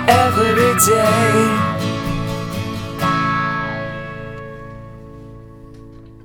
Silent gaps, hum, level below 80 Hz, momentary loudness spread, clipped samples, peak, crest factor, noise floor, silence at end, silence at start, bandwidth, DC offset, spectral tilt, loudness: none; none; -40 dBFS; 22 LU; under 0.1%; 0 dBFS; 18 dB; -38 dBFS; 0.05 s; 0 s; over 20 kHz; under 0.1%; -4.5 dB/octave; -17 LUFS